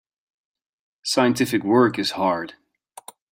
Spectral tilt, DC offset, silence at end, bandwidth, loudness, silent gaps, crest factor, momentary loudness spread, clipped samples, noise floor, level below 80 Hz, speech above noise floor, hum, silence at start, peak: -4.5 dB/octave; under 0.1%; 0.8 s; 16.5 kHz; -21 LUFS; none; 20 dB; 11 LU; under 0.1%; -46 dBFS; -66 dBFS; 25 dB; none; 1.05 s; -4 dBFS